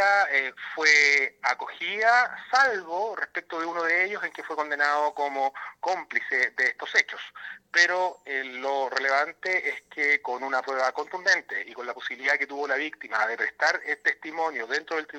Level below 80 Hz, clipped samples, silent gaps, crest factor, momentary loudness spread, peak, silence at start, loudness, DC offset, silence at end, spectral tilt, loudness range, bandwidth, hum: -80 dBFS; under 0.1%; none; 22 dB; 11 LU; -4 dBFS; 0 s; -25 LUFS; under 0.1%; 0 s; -0.5 dB/octave; 4 LU; 15 kHz; none